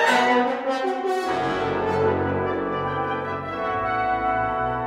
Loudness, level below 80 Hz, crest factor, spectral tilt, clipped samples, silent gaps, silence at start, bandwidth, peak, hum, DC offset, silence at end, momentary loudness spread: -23 LUFS; -48 dBFS; 18 dB; -5.5 dB/octave; under 0.1%; none; 0 s; 15 kHz; -6 dBFS; none; under 0.1%; 0 s; 6 LU